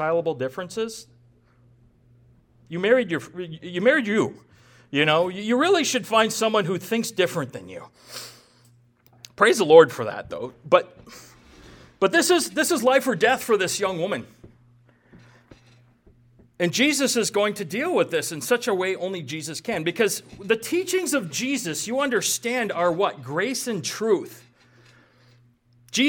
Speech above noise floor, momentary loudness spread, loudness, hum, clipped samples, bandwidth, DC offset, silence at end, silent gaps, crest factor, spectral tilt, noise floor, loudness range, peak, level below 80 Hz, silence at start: 36 dB; 13 LU; -22 LUFS; none; under 0.1%; 19 kHz; under 0.1%; 0 s; none; 24 dB; -3.5 dB/octave; -58 dBFS; 6 LU; 0 dBFS; -64 dBFS; 0 s